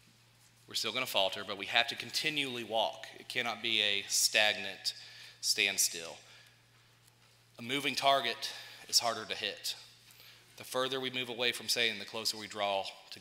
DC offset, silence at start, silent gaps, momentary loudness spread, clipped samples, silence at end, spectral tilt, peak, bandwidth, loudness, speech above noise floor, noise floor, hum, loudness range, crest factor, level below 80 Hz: under 0.1%; 0.7 s; none; 13 LU; under 0.1%; 0 s; -0.5 dB/octave; -10 dBFS; 16 kHz; -32 LUFS; 30 dB; -64 dBFS; none; 4 LU; 24 dB; -80 dBFS